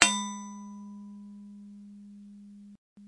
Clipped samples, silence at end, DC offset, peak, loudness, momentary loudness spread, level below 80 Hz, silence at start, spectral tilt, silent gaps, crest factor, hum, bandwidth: under 0.1%; 0 s; under 0.1%; 0 dBFS; -33 LUFS; 16 LU; -70 dBFS; 0 s; -1 dB/octave; 2.78-2.96 s; 34 dB; 60 Hz at -85 dBFS; 11.5 kHz